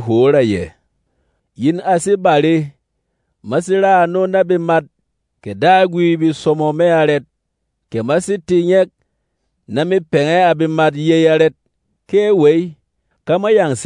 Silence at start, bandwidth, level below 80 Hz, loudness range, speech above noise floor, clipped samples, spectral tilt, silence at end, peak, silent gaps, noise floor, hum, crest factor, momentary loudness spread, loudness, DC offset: 0 s; 11 kHz; -58 dBFS; 3 LU; 58 dB; under 0.1%; -6 dB/octave; 0 s; 0 dBFS; none; -72 dBFS; none; 14 dB; 9 LU; -14 LUFS; under 0.1%